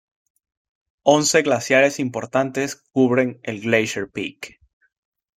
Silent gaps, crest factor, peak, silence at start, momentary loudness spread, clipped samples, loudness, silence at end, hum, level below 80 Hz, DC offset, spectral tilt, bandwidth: none; 20 dB; -2 dBFS; 1.05 s; 13 LU; under 0.1%; -20 LUFS; 0.9 s; none; -64 dBFS; under 0.1%; -4 dB/octave; 16 kHz